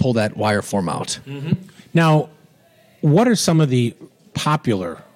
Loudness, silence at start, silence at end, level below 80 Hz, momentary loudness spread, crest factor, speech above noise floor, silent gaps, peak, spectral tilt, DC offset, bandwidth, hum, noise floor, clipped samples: -19 LUFS; 0 s; 0.15 s; -56 dBFS; 10 LU; 14 dB; 35 dB; none; -4 dBFS; -6 dB/octave; under 0.1%; 15 kHz; none; -53 dBFS; under 0.1%